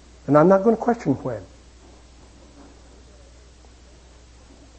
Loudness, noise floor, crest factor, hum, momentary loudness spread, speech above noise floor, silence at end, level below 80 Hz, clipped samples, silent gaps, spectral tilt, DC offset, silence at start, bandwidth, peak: -19 LUFS; -48 dBFS; 22 dB; none; 15 LU; 30 dB; 3.35 s; -50 dBFS; under 0.1%; none; -8.5 dB/octave; under 0.1%; 0.3 s; 8.6 kHz; -2 dBFS